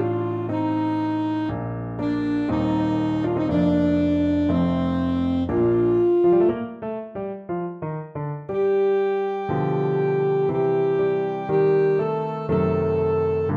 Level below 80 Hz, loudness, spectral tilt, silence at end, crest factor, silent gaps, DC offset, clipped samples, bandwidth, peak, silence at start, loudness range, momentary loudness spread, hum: -48 dBFS; -22 LUFS; -9.5 dB/octave; 0 s; 12 dB; none; under 0.1%; under 0.1%; 7.2 kHz; -10 dBFS; 0 s; 3 LU; 10 LU; none